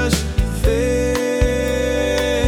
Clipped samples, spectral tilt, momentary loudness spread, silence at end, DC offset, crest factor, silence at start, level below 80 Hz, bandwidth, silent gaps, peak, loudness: under 0.1%; -5 dB/octave; 1 LU; 0 s; under 0.1%; 14 dB; 0 s; -24 dBFS; 18 kHz; none; -2 dBFS; -19 LUFS